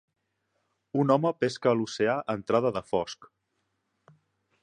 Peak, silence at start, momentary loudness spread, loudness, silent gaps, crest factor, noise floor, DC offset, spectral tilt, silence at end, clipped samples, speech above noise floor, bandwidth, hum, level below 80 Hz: -8 dBFS; 0.95 s; 8 LU; -27 LUFS; none; 22 dB; -78 dBFS; under 0.1%; -6 dB/octave; 1.4 s; under 0.1%; 51 dB; 10.5 kHz; none; -66 dBFS